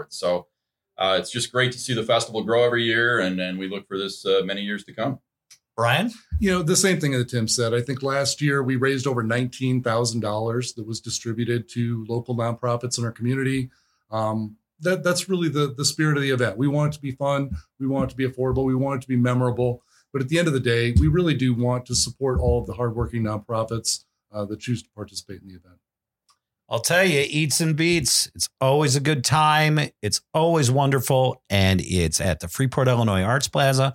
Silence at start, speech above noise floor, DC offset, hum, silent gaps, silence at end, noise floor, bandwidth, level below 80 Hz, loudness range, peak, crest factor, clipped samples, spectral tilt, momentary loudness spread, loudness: 0 s; 45 dB; under 0.1%; none; none; 0 s; -67 dBFS; 17 kHz; -40 dBFS; 6 LU; -4 dBFS; 18 dB; under 0.1%; -4.5 dB/octave; 10 LU; -22 LUFS